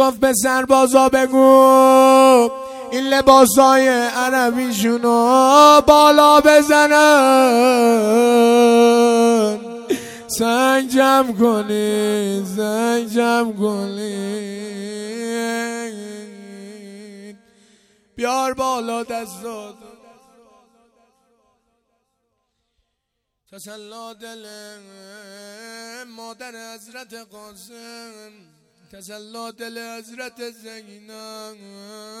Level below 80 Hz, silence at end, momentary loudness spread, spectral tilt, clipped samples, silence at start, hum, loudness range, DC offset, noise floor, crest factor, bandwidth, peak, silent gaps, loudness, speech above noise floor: -52 dBFS; 0 s; 25 LU; -3.5 dB/octave; under 0.1%; 0 s; none; 24 LU; under 0.1%; -77 dBFS; 16 dB; 16.5 kHz; 0 dBFS; none; -14 LUFS; 61 dB